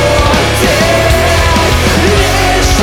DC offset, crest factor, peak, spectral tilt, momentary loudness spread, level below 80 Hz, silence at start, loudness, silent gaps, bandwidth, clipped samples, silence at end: under 0.1%; 8 dB; 0 dBFS; -4 dB/octave; 1 LU; -16 dBFS; 0 s; -9 LUFS; none; 19 kHz; under 0.1%; 0 s